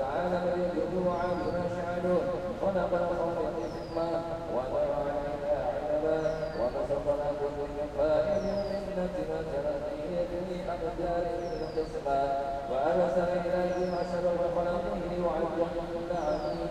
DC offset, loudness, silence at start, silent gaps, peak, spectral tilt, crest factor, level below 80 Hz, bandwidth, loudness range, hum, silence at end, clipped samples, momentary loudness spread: under 0.1%; -31 LUFS; 0 s; none; -16 dBFS; -7 dB/octave; 14 dB; -48 dBFS; 11.5 kHz; 3 LU; none; 0 s; under 0.1%; 5 LU